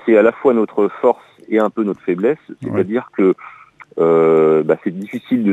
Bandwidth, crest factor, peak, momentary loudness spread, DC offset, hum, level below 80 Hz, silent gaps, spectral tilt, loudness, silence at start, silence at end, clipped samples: 8 kHz; 16 dB; 0 dBFS; 12 LU; under 0.1%; none; -64 dBFS; none; -9 dB/octave; -16 LUFS; 0.05 s; 0 s; under 0.1%